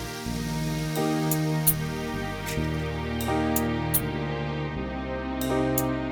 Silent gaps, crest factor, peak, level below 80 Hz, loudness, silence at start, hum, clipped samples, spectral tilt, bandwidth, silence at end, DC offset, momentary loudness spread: none; 22 dB; -4 dBFS; -40 dBFS; -27 LUFS; 0 s; none; under 0.1%; -5 dB/octave; over 20 kHz; 0 s; under 0.1%; 8 LU